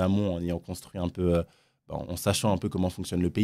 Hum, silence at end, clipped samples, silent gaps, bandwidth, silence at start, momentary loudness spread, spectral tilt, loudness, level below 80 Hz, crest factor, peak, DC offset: none; 0 s; under 0.1%; none; 16 kHz; 0 s; 12 LU; -6 dB/octave; -29 LUFS; -52 dBFS; 18 dB; -10 dBFS; under 0.1%